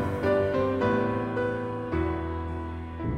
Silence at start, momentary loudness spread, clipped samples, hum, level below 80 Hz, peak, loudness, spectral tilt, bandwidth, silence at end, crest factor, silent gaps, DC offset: 0 s; 9 LU; under 0.1%; none; -42 dBFS; -12 dBFS; -28 LUFS; -8.5 dB/octave; 11 kHz; 0 s; 14 dB; none; under 0.1%